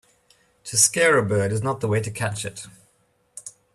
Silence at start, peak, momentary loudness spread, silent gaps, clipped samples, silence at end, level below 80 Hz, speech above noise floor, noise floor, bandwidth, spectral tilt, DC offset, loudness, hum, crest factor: 0.65 s; -4 dBFS; 23 LU; none; under 0.1%; 0.25 s; -60 dBFS; 43 dB; -65 dBFS; 14.5 kHz; -3.5 dB/octave; under 0.1%; -21 LUFS; none; 22 dB